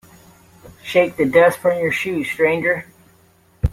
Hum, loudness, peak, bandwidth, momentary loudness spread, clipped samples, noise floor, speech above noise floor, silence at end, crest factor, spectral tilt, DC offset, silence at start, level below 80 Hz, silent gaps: none; -18 LUFS; -2 dBFS; 16 kHz; 10 LU; under 0.1%; -54 dBFS; 37 dB; 0 s; 18 dB; -6 dB/octave; under 0.1%; 0.65 s; -38 dBFS; none